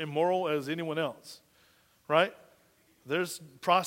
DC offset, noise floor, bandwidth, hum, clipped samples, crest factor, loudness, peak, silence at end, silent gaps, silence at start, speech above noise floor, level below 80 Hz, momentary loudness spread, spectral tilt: under 0.1%; -66 dBFS; 16 kHz; none; under 0.1%; 22 dB; -31 LUFS; -10 dBFS; 0 s; none; 0 s; 36 dB; -78 dBFS; 15 LU; -4.5 dB/octave